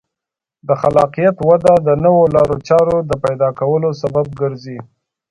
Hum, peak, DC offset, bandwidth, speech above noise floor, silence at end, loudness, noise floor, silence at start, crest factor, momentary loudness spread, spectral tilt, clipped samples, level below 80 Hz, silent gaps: none; 0 dBFS; under 0.1%; 11 kHz; 71 dB; 0.45 s; -14 LUFS; -85 dBFS; 0.65 s; 14 dB; 10 LU; -8 dB/octave; under 0.1%; -44 dBFS; none